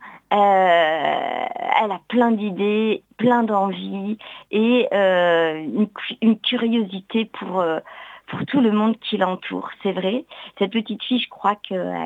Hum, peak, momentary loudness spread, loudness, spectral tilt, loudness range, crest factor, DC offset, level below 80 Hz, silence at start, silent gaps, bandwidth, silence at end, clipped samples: none; -2 dBFS; 11 LU; -21 LUFS; -7.5 dB/octave; 4 LU; 18 dB; under 0.1%; -72 dBFS; 0 s; none; 7.6 kHz; 0 s; under 0.1%